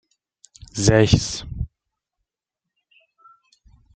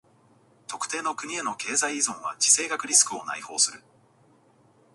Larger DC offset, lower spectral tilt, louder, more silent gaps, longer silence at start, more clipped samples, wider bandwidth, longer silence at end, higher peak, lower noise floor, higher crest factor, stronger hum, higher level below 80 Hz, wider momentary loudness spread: neither; first, -5 dB/octave vs 1 dB/octave; first, -20 LUFS vs -24 LUFS; neither; about the same, 0.75 s vs 0.7 s; neither; second, 9.4 kHz vs 12 kHz; first, 2.3 s vs 1.15 s; about the same, -2 dBFS vs -4 dBFS; first, -85 dBFS vs -60 dBFS; about the same, 22 dB vs 24 dB; neither; first, -38 dBFS vs -80 dBFS; first, 18 LU vs 13 LU